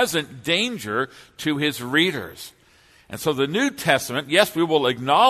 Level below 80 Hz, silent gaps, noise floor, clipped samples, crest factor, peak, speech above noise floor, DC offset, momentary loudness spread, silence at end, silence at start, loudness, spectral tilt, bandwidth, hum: -60 dBFS; none; -55 dBFS; under 0.1%; 20 dB; -2 dBFS; 33 dB; under 0.1%; 12 LU; 0 s; 0 s; -22 LUFS; -3.5 dB/octave; 13.5 kHz; none